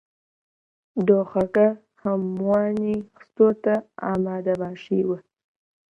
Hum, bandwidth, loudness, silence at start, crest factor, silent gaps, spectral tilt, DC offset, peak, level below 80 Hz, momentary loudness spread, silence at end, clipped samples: none; 6.4 kHz; -23 LUFS; 0.95 s; 20 dB; none; -9.5 dB/octave; under 0.1%; -4 dBFS; -60 dBFS; 9 LU; 0.75 s; under 0.1%